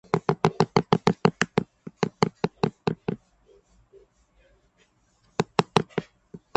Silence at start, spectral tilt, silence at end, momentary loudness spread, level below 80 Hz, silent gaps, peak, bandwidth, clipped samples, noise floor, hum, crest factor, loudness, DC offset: 0.15 s; -6 dB/octave; 0.2 s; 12 LU; -56 dBFS; none; 0 dBFS; 8.8 kHz; under 0.1%; -65 dBFS; none; 26 dB; -26 LUFS; under 0.1%